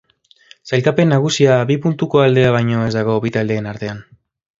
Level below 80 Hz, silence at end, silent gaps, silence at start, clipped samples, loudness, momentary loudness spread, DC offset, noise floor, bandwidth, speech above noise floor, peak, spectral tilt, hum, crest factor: -50 dBFS; 0.6 s; none; 0.65 s; under 0.1%; -15 LUFS; 11 LU; under 0.1%; -49 dBFS; 7.8 kHz; 34 dB; 0 dBFS; -6.5 dB/octave; none; 16 dB